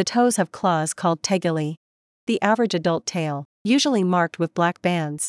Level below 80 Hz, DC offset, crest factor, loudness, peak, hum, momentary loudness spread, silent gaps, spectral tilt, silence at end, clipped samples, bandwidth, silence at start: -70 dBFS; under 0.1%; 18 dB; -22 LUFS; -4 dBFS; none; 8 LU; 1.77-2.27 s, 3.45-3.65 s; -4.5 dB/octave; 0 s; under 0.1%; 12 kHz; 0 s